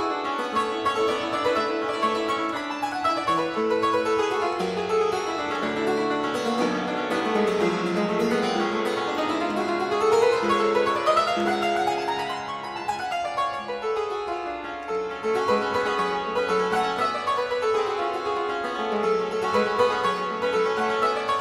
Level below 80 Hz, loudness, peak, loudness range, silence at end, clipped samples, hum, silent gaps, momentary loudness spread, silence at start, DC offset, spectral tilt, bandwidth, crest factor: -60 dBFS; -25 LUFS; -8 dBFS; 4 LU; 0 s; under 0.1%; none; none; 6 LU; 0 s; under 0.1%; -4.5 dB/octave; 14 kHz; 16 dB